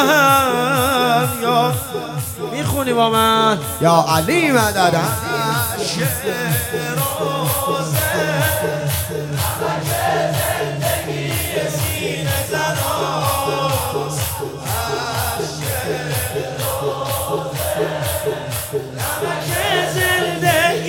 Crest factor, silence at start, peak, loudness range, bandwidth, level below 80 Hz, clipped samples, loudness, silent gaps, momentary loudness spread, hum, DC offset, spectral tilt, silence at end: 18 dB; 0 s; 0 dBFS; 6 LU; 17.5 kHz; -44 dBFS; under 0.1%; -18 LUFS; none; 8 LU; none; under 0.1%; -4 dB/octave; 0 s